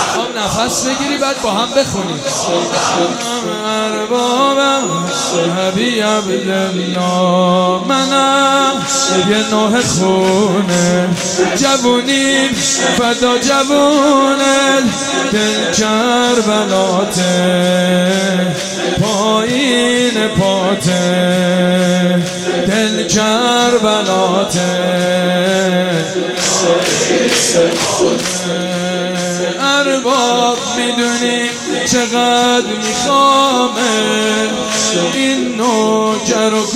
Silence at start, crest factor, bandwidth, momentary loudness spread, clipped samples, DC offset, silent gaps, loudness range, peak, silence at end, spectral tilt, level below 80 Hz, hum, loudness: 0 s; 12 dB; 15.5 kHz; 5 LU; under 0.1%; under 0.1%; none; 3 LU; 0 dBFS; 0 s; -3.5 dB/octave; -48 dBFS; none; -13 LUFS